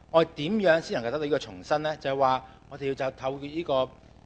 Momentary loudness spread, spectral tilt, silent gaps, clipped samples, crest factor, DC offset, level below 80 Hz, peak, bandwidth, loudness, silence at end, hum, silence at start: 10 LU; -5.5 dB/octave; none; under 0.1%; 20 dB; under 0.1%; -58 dBFS; -8 dBFS; 8.6 kHz; -28 LUFS; 0.35 s; none; 0.15 s